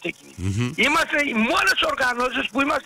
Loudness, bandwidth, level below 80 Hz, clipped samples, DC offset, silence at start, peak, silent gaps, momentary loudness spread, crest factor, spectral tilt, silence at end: -20 LUFS; 16 kHz; -50 dBFS; under 0.1%; under 0.1%; 0 s; -10 dBFS; none; 9 LU; 12 dB; -4 dB/octave; 0.05 s